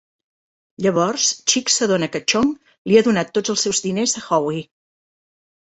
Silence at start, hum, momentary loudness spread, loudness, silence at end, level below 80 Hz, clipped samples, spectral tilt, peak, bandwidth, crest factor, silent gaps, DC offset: 0.8 s; none; 6 LU; -18 LUFS; 1.1 s; -58 dBFS; under 0.1%; -3 dB/octave; -2 dBFS; 8.4 kHz; 18 dB; 2.78-2.85 s; under 0.1%